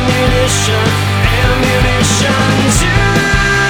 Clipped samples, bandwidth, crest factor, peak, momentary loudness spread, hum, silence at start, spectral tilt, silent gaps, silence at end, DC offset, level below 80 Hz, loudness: under 0.1%; 19.5 kHz; 10 dB; 0 dBFS; 2 LU; none; 0 s; -4 dB/octave; none; 0 s; under 0.1%; -20 dBFS; -11 LUFS